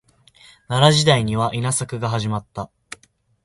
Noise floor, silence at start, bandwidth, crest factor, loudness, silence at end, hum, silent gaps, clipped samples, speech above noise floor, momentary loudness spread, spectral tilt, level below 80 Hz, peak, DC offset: -58 dBFS; 0.7 s; 11.5 kHz; 20 dB; -19 LUFS; 0.8 s; none; none; under 0.1%; 39 dB; 23 LU; -4.5 dB/octave; -50 dBFS; -2 dBFS; under 0.1%